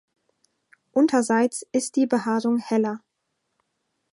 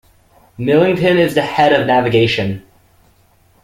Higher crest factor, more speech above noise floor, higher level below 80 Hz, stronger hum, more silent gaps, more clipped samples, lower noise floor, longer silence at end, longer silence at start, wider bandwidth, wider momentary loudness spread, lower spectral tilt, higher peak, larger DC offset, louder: about the same, 16 dB vs 14 dB; first, 55 dB vs 40 dB; second, -76 dBFS vs -48 dBFS; neither; neither; neither; first, -77 dBFS vs -53 dBFS; about the same, 1.15 s vs 1.05 s; first, 0.95 s vs 0.6 s; second, 11.5 kHz vs 16 kHz; second, 7 LU vs 10 LU; second, -4.5 dB/octave vs -6.5 dB/octave; second, -8 dBFS vs 0 dBFS; neither; second, -23 LUFS vs -14 LUFS